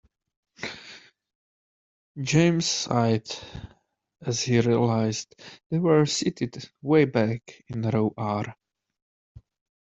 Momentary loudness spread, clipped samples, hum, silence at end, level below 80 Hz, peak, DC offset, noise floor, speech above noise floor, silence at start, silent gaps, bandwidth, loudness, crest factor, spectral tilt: 16 LU; under 0.1%; none; 1.3 s; -58 dBFS; -6 dBFS; under 0.1%; -49 dBFS; 25 dB; 0.6 s; 1.35-2.15 s, 5.66-5.70 s; 8.2 kHz; -25 LUFS; 20 dB; -5.5 dB/octave